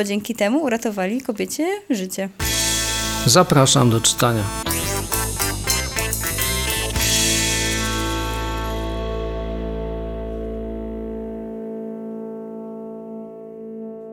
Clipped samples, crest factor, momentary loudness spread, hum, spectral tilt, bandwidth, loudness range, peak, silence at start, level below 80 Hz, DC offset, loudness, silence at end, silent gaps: under 0.1%; 20 dB; 18 LU; none; -3.5 dB/octave; 19 kHz; 13 LU; -2 dBFS; 0 s; -32 dBFS; under 0.1%; -20 LUFS; 0 s; none